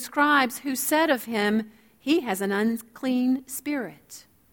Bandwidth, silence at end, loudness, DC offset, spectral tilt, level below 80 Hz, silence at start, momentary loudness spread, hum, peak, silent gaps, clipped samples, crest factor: 20 kHz; 0.3 s; -25 LUFS; under 0.1%; -3.5 dB/octave; -68 dBFS; 0 s; 17 LU; none; -8 dBFS; none; under 0.1%; 18 dB